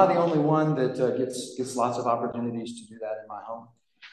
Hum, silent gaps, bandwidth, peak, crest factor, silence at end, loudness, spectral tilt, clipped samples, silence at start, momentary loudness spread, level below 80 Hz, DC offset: none; none; 12.5 kHz; -8 dBFS; 20 dB; 0.05 s; -27 LUFS; -6.5 dB/octave; under 0.1%; 0 s; 15 LU; -72 dBFS; under 0.1%